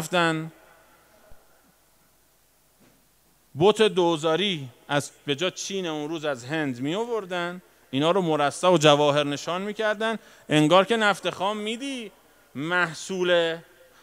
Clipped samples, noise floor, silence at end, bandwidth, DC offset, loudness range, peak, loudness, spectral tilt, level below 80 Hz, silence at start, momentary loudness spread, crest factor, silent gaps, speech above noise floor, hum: under 0.1%; -63 dBFS; 0.4 s; 16 kHz; under 0.1%; 7 LU; -2 dBFS; -24 LUFS; -4.5 dB/octave; -70 dBFS; 0 s; 14 LU; 24 dB; none; 39 dB; none